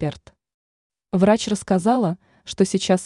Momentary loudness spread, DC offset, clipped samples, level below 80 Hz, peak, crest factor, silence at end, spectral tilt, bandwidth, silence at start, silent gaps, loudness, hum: 12 LU; under 0.1%; under 0.1%; -54 dBFS; -4 dBFS; 18 dB; 0 s; -5.5 dB/octave; 11 kHz; 0 s; 0.54-0.90 s; -20 LUFS; none